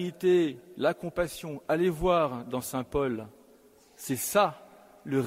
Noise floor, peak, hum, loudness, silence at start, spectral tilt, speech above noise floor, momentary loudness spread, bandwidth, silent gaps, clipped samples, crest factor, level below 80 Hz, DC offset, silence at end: -58 dBFS; -10 dBFS; none; -29 LUFS; 0 s; -5 dB/octave; 30 dB; 12 LU; 16 kHz; none; under 0.1%; 20 dB; -52 dBFS; under 0.1%; 0 s